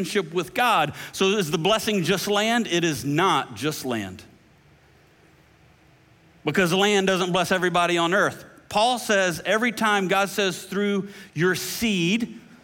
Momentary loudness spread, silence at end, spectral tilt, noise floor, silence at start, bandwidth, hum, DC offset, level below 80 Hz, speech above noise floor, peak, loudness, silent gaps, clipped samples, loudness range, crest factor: 8 LU; 0.1 s; -4 dB/octave; -56 dBFS; 0 s; 17 kHz; none; under 0.1%; -60 dBFS; 33 dB; -8 dBFS; -22 LUFS; none; under 0.1%; 6 LU; 16 dB